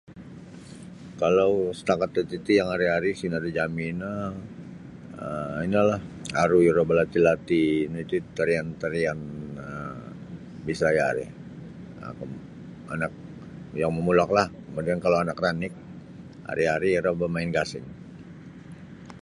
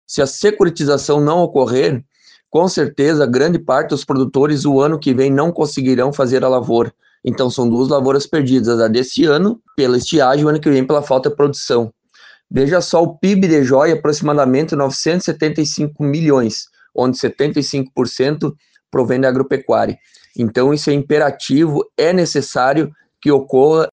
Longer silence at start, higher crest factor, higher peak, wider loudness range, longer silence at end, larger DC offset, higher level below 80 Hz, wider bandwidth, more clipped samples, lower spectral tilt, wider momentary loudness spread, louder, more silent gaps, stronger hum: about the same, 0.1 s vs 0.1 s; first, 22 dB vs 14 dB; second, -4 dBFS vs 0 dBFS; first, 7 LU vs 3 LU; about the same, 0.05 s vs 0.1 s; neither; about the same, -54 dBFS vs -52 dBFS; first, 11.5 kHz vs 9.8 kHz; neither; about the same, -6.5 dB/octave vs -6 dB/octave; first, 22 LU vs 6 LU; second, -25 LUFS vs -15 LUFS; neither; neither